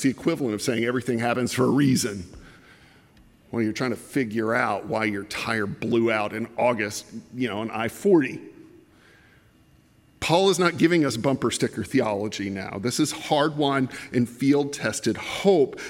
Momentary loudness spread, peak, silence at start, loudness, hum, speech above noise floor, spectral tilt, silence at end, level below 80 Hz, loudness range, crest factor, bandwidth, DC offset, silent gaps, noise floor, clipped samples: 9 LU; -6 dBFS; 0 s; -24 LUFS; none; 34 dB; -5 dB/octave; 0 s; -60 dBFS; 4 LU; 20 dB; 16.5 kHz; under 0.1%; none; -57 dBFS; under 0.1%